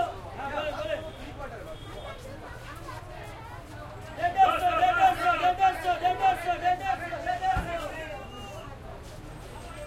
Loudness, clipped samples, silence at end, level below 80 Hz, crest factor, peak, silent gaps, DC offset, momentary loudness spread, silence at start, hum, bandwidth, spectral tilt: -27 LUFS; under 0.1%; 0 s; -46 dBFS; 18 dB; -10 dBFS; none; under 0.1%; 20 LU; 0 s; none; 15.5 kHz; -4.5 dB/octave